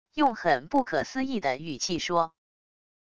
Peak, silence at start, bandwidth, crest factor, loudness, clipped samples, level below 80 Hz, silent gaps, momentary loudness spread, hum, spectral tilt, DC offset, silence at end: -10 dBFS; 0.05 s; 10 kHz; 18 dB; -28 LUFS; under 0.1%; -60 dBFS; none; 6 LU; none; -4 dB/octave; 0.4%; 0.65 s